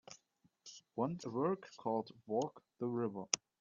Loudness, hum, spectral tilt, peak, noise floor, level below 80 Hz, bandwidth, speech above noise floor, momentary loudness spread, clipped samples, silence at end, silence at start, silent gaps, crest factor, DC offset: -40 LUFS; none; -5 dB/octave; -10 dBFS; -76 dBFS; -82 dBFS; 8 kHz; 37 dB; 18 LU; under 0.1%; 0.25 s; 0.1 s; none; 30 dB; under 0.1%